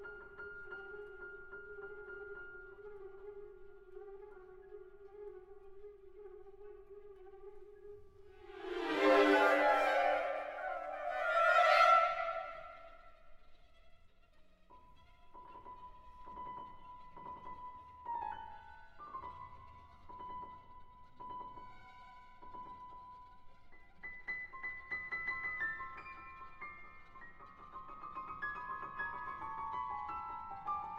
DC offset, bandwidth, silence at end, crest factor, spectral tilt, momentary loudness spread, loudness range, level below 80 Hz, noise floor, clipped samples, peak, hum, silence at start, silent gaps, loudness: under 0.1%; 15.5 kHz; 0 s; 22 dB; -4 dB/octave; 26 LU; 23 LU; -64 dBFS; -62 dBFS; under 0.1%; -18 dBFS; none; 0 s; none; -35 LUFS